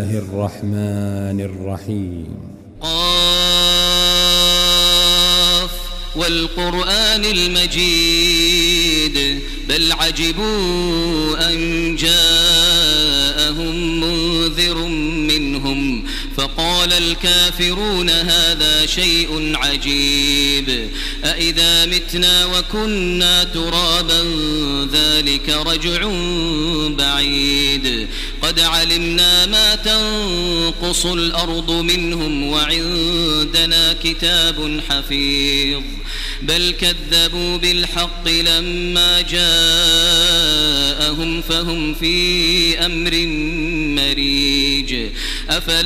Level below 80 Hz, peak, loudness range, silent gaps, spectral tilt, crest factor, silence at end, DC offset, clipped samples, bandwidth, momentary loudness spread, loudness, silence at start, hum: -26 dBFS; -2 dBFS; 4 LU; none; -2.5 dB/octave; 16 dB; 0 s; under 0.1%; under 0.1%; 16 kHz; 10 LU; -14 LUFS; 0 s; none